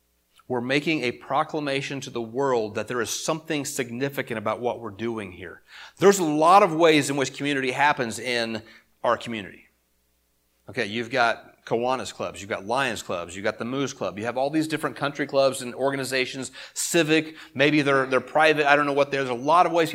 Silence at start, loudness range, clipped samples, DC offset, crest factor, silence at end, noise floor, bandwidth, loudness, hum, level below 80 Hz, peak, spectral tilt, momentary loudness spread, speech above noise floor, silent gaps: 0.5 s; 8 LU; under 0.1%; under 0.1%; 24 dB; 0 s; -68 dBFS; 16.5 kHz; -24 LUFS; none; -66 dBFS; -2 dBFS; -4 dB/octave; 13 LU; 44 dB; none